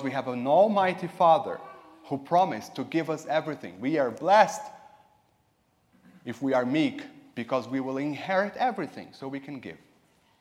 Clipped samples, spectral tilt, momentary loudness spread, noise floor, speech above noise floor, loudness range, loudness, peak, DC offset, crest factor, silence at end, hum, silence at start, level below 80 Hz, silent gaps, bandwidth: under 0.1%; -5.5 dB/octave; 19 LU; -69 dBFS; 42 dB; 6 LU; -26 LUFS; -6 dBFS; under 0.1%; 22 dB; 0.65 s; none; 0 s; -76 dBFS; none; 15 kHz